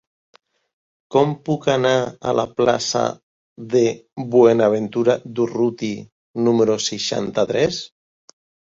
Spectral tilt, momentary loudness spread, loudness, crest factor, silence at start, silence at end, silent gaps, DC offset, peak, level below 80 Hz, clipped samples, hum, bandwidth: -5 dB/octave; 12 LU; -19 LUFS; 18 dB; 1.1 s; 0.85 s; 3.23-3.56 s, 6.12-6.34 s; under 0.1%; -2 dBFS; -58 dBFS; under 0.1%; none; 7.8 kHz